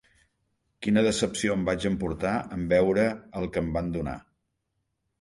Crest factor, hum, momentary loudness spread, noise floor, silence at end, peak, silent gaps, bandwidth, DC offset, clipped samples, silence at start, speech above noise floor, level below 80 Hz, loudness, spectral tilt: 18 dB; none; 11 LU; -79 dBFS; 1 s; -10 dBFS; none; 11.5 kHz; under 0.1%; under 0.1%; 0.8 s; 53 dB; -48 dBFS; -27 LUFS; -5.5 dB/octave